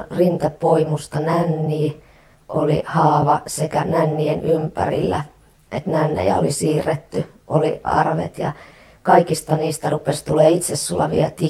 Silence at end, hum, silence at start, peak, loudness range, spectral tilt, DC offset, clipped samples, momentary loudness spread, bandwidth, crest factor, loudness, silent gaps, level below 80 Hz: 0 s; none; 0 s; 0 dBFS; 2 LU; -6 dB/octave; under 0.1%; under 0.1%; 10 LU; 14.5 kHz; 18 dB; -19 LUFS; none; -48 dBFS